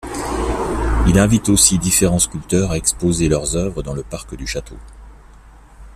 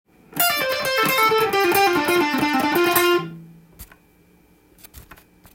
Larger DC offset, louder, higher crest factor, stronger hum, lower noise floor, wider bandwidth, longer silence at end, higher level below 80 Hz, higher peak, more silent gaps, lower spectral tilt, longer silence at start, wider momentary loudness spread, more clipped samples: neither; about the same, -16 LUFS vs -18 LUFS; about the same, 18 dB vs 18 dB; neither; second, -43 dBFS vs -55 dBFS; second, 15 kHz vs 17 kHz; second, 0 s vs 0.55 s; first, -28 dBFS vs -56 dBFS; first, 0 dBFS vs -4 dBFS; neither; about the same, -4 dB/octave vs -3 dB/octave; second, 0.05 s vs 0.3 s; first, 15 LU vs 4 LU; neither